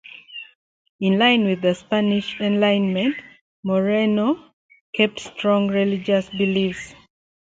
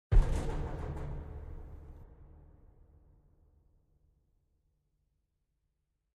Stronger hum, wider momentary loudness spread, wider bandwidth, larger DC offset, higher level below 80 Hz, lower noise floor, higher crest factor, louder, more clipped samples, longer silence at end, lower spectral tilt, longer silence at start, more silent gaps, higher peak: neither; second, 16 LU vs 26 LU; second, 7.8 kHz vs 9.8 kHz; neither; second, -60 dBFS vs -38 dBFS; second, -40 dBFS vs -82 dBFS; second, 18 dB vs 24 dB; first, -20 LUFS vs -38 LUFS; neither; second, 0.65 s vs 3.9 s; about the same, -6.5 dB/octave vs -7.5 dB/octave; first, 0.3 s vs 0.1 s; first, 0.55-0.99 s, 3.41-3.63 s, 4.53-4.69 s, 4.81-4.93 s vs none; first, -4 dBFS vs -12 dBFS